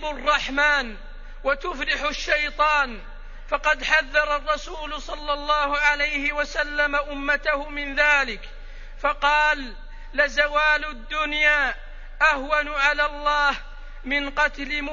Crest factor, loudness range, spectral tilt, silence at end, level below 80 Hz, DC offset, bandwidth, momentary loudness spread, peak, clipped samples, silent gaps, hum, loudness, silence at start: 20 dB; 2 LU; -2.5 dB/octave; 0 s; -36 dBFS; under 0.1%; 7.4 kHz; 11 LU; -4 dBFS; under 0.1%; none; none; -22 LUFS; 0 s